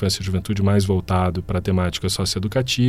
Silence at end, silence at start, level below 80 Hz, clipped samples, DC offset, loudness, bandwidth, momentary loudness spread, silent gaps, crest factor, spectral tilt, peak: 0 s; 0 s; -38 dBFS; under 0.1%; under 0.1%; -21 LUFS; 15.5 kHz; 4 LU; none; 14 dB; -5.5 dB/octave; -6 dBFS